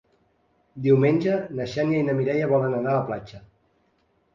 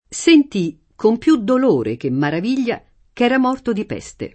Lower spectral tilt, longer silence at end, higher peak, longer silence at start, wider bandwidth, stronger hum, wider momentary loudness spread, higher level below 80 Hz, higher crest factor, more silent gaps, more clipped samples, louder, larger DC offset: first, -8.5 dB/octave vs -5.5 dB/octave; first, 0.95 s vs 0.05 s; second, -8 dBFS vs 0 dBFS; first, 0.75 s vs 0.1 s; second, 7.4 kHz vs 8.8 kHz; neither; about the same, 10 LU vs 11 LU; second, -60 dBFS vs -52 dBFS; about the same, 18 dB vs 16 dB; neither; neither; second, -23 LUFS vs -17 LUFS; neither